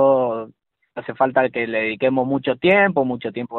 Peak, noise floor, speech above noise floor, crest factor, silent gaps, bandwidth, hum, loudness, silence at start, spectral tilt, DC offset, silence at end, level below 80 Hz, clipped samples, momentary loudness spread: -4 dBFS; -52 dBFS; 33 dB; 16 dB; none; 4.3 kHz; none; -19 LUFS; 0 s; -4 dB/octave; under 0.1%; 0 s; -60 dBFS; under 0.1%; 17 LU